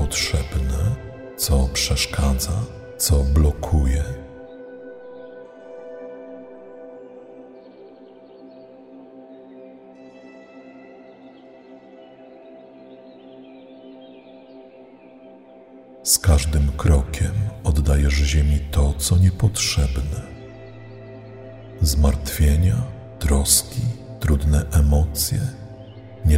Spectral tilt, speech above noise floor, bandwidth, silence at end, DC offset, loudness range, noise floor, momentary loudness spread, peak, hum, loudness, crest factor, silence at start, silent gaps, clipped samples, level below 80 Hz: -4.5 dB/octave; 27 dB; 16 kHz; 0 s; under 0.1%; 24 LU; -45 dBFS; 25 LU; -2 dBFS; none; -20 LUFS; 20 dB; 0 s; none; under 0.1%; -26 dBFS